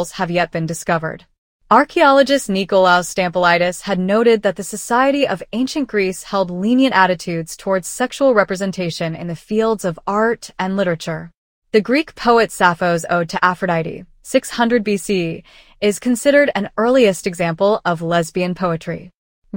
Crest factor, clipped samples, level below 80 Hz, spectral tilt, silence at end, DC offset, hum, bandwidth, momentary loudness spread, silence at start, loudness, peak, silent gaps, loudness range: 16 dB; under 0.1%; -50 dBFS; -5 dB/octave; 0 s; under 0.1%; none; 17 kHz; 9 LU; 0 s; -17 LUFS; 0 dBFS; 1.38-1.59 s, 11.37-11.62 s, 19.16-19.42 s; 4 LU